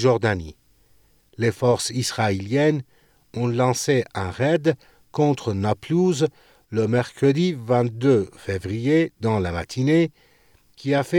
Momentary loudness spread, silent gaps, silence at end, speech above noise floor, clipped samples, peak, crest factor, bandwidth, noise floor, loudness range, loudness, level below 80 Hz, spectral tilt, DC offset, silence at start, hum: 9 LU; none; 0 s; 37 dB; under 0.1%; -6 dBFS; 16 dB; 17.5 kHz; -58 dBFS; 2 LU; -22 LUFS; -56 dBFS; -6 dB/octave; under 0.1%; 0 s; none